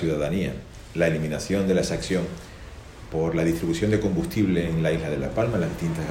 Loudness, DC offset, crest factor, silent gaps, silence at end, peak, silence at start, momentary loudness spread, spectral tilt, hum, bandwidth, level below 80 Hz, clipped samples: -25 LUFS; under 0.1%; 16 dB; none; 0 s; -8 dBFS; 0 s; 13 LU; -6.5 dB/octave; none; 16.5 kHz; -42 dBFS; under 0.1%